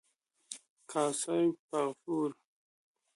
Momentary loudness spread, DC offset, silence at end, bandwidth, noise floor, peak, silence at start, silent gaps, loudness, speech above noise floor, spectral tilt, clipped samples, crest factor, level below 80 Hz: 16 LU; under 0.1%; 0.8 s; 11.5 kHz; -53 dBFS; -18 dBFS; 0.5 s; 0.70-0.77 s, 1.59-1.69 s; -34 LUFS; 20 dB; -4.5 dB/octave; under 0.1%; 18 dB; -86 dBFS